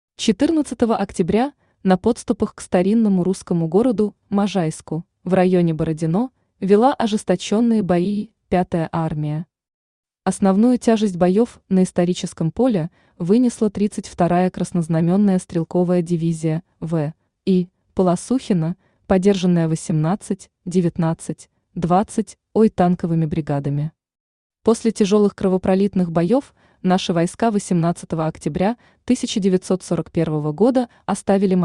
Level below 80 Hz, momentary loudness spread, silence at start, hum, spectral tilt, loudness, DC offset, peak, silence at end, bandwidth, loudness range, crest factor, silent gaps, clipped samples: -50 dBFS; 9 LU; 0.2 s; none; -7 dB/octave; -20 LUFS; under 0.1%; -4 dBFS; 0 s; 11 kHz; 2 LU; 16 dB; 9.74-10.03 s, 24.20-24.50 s; under 0.1%